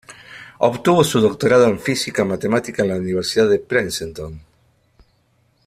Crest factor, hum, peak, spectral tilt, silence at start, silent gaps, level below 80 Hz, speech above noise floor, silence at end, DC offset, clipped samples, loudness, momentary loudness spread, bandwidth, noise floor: 18 dB; none; -2 dBFS; -5 dB/octave; 0.1 s; none; -50 dBFS; 44 dB; 1.25 s; under 0.1%; under 0.1%; -18 LUFS; 18 LU; 15 kHz; -61 dBFS